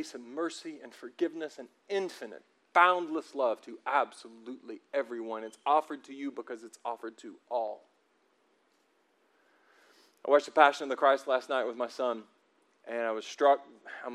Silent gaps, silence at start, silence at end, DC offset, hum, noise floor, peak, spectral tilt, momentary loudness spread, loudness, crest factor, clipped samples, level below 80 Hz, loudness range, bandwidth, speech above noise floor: none; 0 s; 0 s; under 0.1%; none; -71 dBFS; -6 dBFS; -3 dB/octave; 21 LU; -31 LUFS; 26 dB; under 0.1%; under -90 dBFS; 12 LU; 12.5 kHz; 40 dB